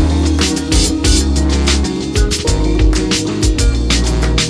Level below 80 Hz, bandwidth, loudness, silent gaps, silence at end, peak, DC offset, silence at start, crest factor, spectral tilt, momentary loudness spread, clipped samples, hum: -16 dBFS; 11 kHz; -14 LUFS; none; 0 s; 0 dBFS; under 0.1%; 0 s; 12 dB; -4.5 dB/octave; 3 LU; under 0.1%; none